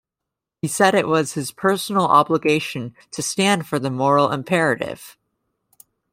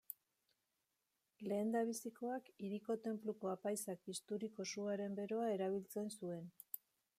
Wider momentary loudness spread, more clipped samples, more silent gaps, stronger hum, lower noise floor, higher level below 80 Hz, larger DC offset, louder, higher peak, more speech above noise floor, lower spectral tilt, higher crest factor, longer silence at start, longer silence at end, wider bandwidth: about the same, 13 LU vs 11 LU; neither; neither; neither; second, -84 dBFS vs -88 dBFS; first, -64 dBFS vs under -90 dBFS; neither; first, -19 LUFS vs -44 LUFS; first, -2 dBFS vs -26 dBFS; first, 65 dB vs 45 dB; about the same, -4.5 dB/octave vs -5 dB/octave; about the same, 18 dB vs 18 dB; first, 0.65 s vs 0.1 s; first, 1 s vs 0.4 s; about the same, 16 kHz vs 15 kHz